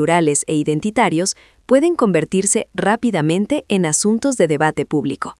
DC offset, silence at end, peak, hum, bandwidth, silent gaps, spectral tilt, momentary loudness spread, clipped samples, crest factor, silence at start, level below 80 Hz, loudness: under 0.1%; 0.1 s; -2 dBFS; none; 12 kHz; none; -4.5 dB/octave; 5 LU; under 0.1%; 16 dB; 0 s; -54 dBFS; -17 LUFS